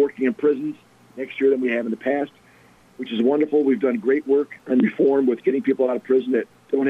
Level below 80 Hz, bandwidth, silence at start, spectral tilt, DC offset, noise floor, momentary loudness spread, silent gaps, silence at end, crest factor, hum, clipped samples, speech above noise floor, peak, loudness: -72 dBFS; 4.3 kHz; 0 s; -8 dB/octave; under 0.1%; -53 dBFS; 11 LU; none; 0 s; 12 dB; none; under 0.1%; 32 dB; -10 dBFS; -21 LUFS